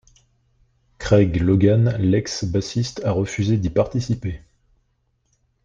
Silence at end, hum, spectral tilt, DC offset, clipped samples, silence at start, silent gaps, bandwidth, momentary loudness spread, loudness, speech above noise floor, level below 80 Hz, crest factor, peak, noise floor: 1.3 s; none; -7 dB/octave; under 0.1%; under 0.1%; 1 s; none; 7.6 kHz; 10 LU; -20 LUFS; 49 dB; -42 dBFS; 18 dB; -4 dBFS; -68 dBFS